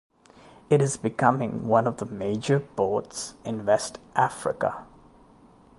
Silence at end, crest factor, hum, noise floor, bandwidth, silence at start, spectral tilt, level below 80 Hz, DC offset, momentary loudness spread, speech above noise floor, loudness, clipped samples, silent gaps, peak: 0.95 s; 22 dB; none; -54 dBFS; 11.5 kHz; 0.7 s; -5.5 dB/octave; -60 dBFS; under 0.1%; 8 LU; 29 dB; -26 LUFS; under 0.1%; none; -4 dBFS